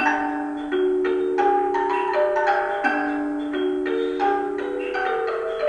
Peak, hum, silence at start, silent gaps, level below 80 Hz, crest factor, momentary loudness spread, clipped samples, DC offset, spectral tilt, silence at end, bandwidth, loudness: -8 dBFS; none; 0 s; none; -56 dBFS; 14 dB; 6 LU; under 0.1%; under 0.1%; -4.5 dB/octave; 0 s; 9.4 kHz; -23 LUFS